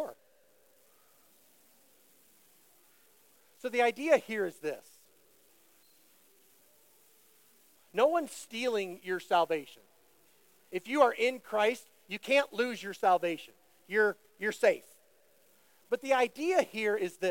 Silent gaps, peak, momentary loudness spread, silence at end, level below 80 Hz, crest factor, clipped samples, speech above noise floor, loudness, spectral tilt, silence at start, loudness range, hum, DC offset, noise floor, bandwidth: none; -10 dBFS; 13 LU; 0 s; -86 dBFS; 24 dB; under 0.1%; 37 dB; -31 LUFS; -3.5 dB/octave; 0 s; 7 LU; none; under 0.1%; -67 dBFS; 17 kHz